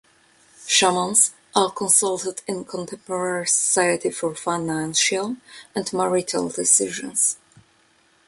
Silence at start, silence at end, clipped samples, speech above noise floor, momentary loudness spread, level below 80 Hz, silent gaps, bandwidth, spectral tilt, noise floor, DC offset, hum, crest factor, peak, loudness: 0.6 s; 0.9 s; under 0.1%; 37 dB; 13 LU; -66 dBFS; none; 12 kHz; -2 dB/octave; -60 dBFS; under 0.1%; none; 22 dB; 0 dBFS; -20 LUFS